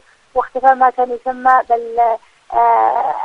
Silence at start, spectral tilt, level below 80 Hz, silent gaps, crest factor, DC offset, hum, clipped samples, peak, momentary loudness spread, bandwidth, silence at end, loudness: 0.35 s; -4.5 dB/octave; -52 dBFS; none; 14 dB; under 0.1%; none; under 0.1%; 0 dBFS; 9 LU; 6.6 kHz; 0 s; -15 LUFS